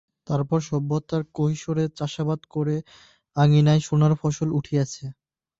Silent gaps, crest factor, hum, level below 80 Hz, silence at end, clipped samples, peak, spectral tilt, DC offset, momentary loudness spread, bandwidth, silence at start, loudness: none; 14 dB; none; -56 dBFS; 0.5 s; under 0.1%; -8 dBFS; -7 dB/octave; under 0.1%; 10 LU; 7.8 kHz; 0.3 s; -24 LUFS